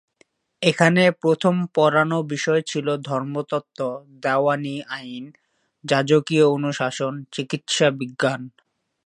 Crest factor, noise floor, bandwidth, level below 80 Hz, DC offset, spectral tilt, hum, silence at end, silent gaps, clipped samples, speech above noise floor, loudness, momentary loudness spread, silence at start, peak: 22 dB; -62 dBFS; 11 kHz; -70 dBFS; under 0.1%; -5 dB/octave; none; 0.55 s; none; under 0.1%; 41 dB; -21 LUFS; 13 LU; 0.6 s; 0 dBFS